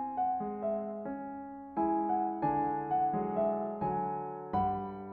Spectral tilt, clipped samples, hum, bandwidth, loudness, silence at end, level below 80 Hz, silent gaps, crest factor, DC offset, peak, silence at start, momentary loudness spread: -8 dB/octave; under 0.1%; none; 4.4 kHz; -34 LUFS; 0 s; -62 dBFS; none; 14 dB; under 0.1%; -20 dBFS; 0 s; 9 LU